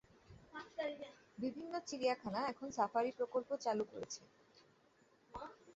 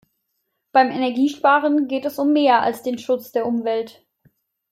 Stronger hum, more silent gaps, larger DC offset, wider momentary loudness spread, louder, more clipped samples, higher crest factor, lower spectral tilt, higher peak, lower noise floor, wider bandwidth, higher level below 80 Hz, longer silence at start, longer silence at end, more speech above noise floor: neither; neither; neither; first, 14 LU vs 8 LU; second, -42 LUFS vs -19 LUFS; neither; about the same, 20 dB vs 18 dB; about the same, -3.5 dB/octave vs -4.5 dB/octave; second, -22 dBFS vs -4 dBFS; about the same, -72 dBFS vs -74 dBFS; second, 8 kHz vs 16 kHz; second, -76 dBFS vs -70 dBFS; second, 0.3 s vs 0.75 s; second, 0.05 s vs 0.8 s; second, 31 dB vs 55 dB